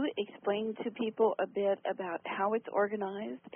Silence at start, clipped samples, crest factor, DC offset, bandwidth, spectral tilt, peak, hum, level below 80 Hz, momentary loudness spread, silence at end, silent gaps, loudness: 0 s; under 0.1%; 16 dB; under 0.1%; 3.6 kHz; -1 dB/octave; -18 dBFS; none; -82 dBFS; 7 LU; 0 s; none; -34 LUFS